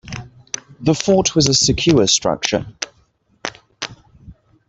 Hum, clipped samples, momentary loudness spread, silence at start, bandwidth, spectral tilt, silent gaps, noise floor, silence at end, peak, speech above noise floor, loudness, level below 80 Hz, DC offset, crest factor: none; under 0.1%; 17 LU; 0.05 s; 8.4 kHz; -3.5 dB/octave; none; -59 dBFS; 0.35 s; 0 dBFS; 43 dB; -15 LUFS; -42 dBFS; under 0.1%; 18 dB